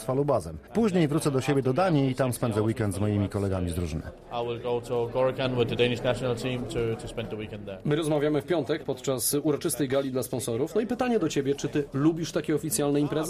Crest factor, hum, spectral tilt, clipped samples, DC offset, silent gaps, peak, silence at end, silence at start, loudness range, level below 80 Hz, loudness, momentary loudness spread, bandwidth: 16 dB; none; -5.5 dB/octave; under 0.1%; under 0.1%; none; -12 dBFS; 0 s; 0 s; 3 LU; -50 dBFS; -27 LUFS; 7 LU; 15 kHz